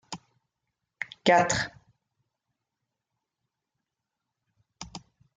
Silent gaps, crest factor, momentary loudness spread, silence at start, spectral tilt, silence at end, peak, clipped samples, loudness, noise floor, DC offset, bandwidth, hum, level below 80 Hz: none; 26 dB; 22 LU; 0.1 s; -3.5 dB/octave; 0.4 s; -8 dBFS; under 0.1%; -25 LUFS; -86 dBFS; under 0.1%; 9.6 kHz; none; -62 dBFS